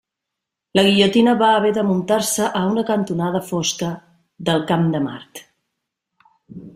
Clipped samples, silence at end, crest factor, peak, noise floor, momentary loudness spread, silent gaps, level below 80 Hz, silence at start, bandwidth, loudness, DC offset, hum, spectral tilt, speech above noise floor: under 0.1%; 0.05 s; 18 dB; -2 dBFS; -82 dBFS; 13 LU; none; -58 dBFS; 0.75 s; 16 kHz; -18 LUFS; under 0.1%; none; -4.5 dB/octave; 64 dB